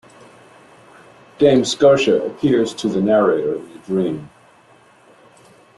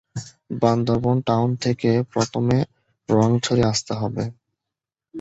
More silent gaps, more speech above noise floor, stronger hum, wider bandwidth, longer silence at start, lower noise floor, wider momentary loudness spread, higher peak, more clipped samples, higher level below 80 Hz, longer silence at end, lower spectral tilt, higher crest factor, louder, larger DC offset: neither; second, 34 dB vs 66 dB; neither; first, 11.5 kHz vs 8.2 kHz; first, 1.4 s vs 0.15 s; second, -50 dBFS vs -86 dBFS; second, 11 LU vs 14 LU; about the same, -2 dBFS vs -2 dBFS; neither; second, -58 dBFS vs -50 dBFS; first, 1.5 s vs 0 s; about the same, -5.5 dB/octave vs -6 dB/octave; about the same, 16 dB vs 20 dB; first, -17 LUFS vs -21 LUFS; neither